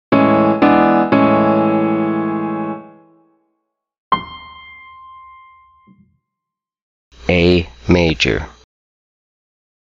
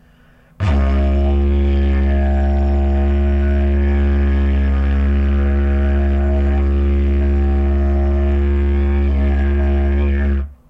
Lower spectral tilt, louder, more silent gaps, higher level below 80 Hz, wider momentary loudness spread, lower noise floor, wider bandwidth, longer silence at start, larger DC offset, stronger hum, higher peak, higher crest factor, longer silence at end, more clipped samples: second, -6.5 dB/octave vs -9.5 dB/octave; about the same, -15 LUFS vs -17 LUFS; first, 3.98-4.11 s, 6.82-7.11 s vs none; second, -40 dBFS vs -16 dBFS; first, 21 LU vs 1 LU; first, -83 dBFS vs -48 dBFS; first, 7.6 kHz vs 3.8 kHz; second, 0.1 s vs 0.6 s; neither; neither; first, -2 dBFS vs -6 dBFS; first, 16 dB vs 8 dB; first, 1.4 s vs 0.15 s; neither